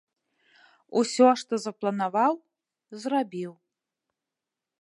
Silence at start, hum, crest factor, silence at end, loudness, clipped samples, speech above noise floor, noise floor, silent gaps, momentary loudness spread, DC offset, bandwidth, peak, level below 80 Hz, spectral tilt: 0.9 s; none; 22 dB; 1.3 s; -26 LUFS; under 0.1%; 63 dB; -88 dBFS; none; 16 LU; under 0.1%; 11.5 kHz; -6 dBFS; -86 dBFS; -4.5 dB/octave